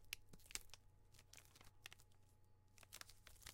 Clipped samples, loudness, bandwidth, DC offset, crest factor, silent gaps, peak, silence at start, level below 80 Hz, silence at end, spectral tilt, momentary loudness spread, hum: under 0.1%; -59 LUFS; 16.5 kHz; under 0.1%; 38 dB; none; -24 dBFS; 0 s; -72 dBFS; 0 s; -0.5 dB/octave; 13 LU; none